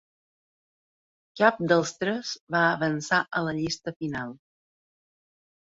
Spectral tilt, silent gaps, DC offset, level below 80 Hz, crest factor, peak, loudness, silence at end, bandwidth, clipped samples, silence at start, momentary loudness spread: -4.5 dB/octave; 2.41-2.47 s, 3.96-4.00 s; under 0.1%; -64 dBFS; 24 dB; -6 dBFS; -26 LUFS; 1.4 s; 8 kHz; under 0.1%; 1.35 s; 10 LU